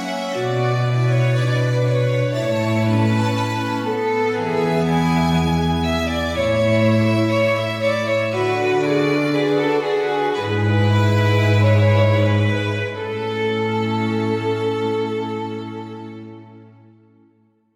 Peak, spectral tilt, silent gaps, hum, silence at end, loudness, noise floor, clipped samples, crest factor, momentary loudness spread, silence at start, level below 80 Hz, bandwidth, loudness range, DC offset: -4 dBFS; -7 dB/octave; none; none; 1.1 s; -19 LUFS; -58 dBFS; under 0.1%; 14 dB; 8 LU; 0 s; -44 dBFS; 13 kHz; 5 LU; under 0.1%